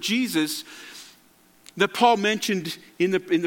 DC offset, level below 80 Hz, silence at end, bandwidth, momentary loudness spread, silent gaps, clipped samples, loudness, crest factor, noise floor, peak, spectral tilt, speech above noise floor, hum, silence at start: under 0.1%; -74 dBFS; 0 s; 17.5 kHz; 21 LU; none; under 0.1%; -23 LUFS; 20 dB; -57 dBFS; -4 dBFS; -4 dB/octave; 34 dB; none; 0 s